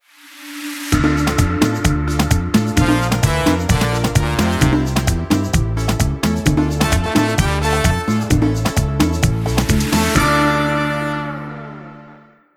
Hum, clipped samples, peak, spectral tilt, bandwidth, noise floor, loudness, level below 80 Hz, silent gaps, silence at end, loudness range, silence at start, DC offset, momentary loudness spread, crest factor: none; under 0.1%; -2 dBFS; -5.5 dB/octave; 19.5 kHz; -44 dBFS; -17 LUFS; -26 dBFS; none; 0.4 s; 1 LU; 0.25 s; under 0.1%; 9 LU; 14 dB